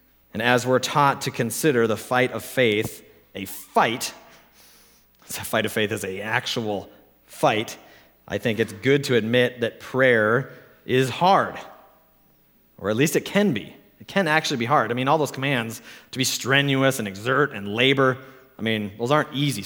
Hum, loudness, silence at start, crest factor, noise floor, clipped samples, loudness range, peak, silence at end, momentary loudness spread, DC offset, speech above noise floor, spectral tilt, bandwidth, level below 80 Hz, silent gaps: none; -22 LUFS; 0.35 s; 22 dB; -59 dBFS; under 0.1%; 5 LU; -2 dBFS; 0 s; 14 LU; under 0.1%; 37 dB; -4.5 dB/octave; over 20 kHz; -64 dBFS; none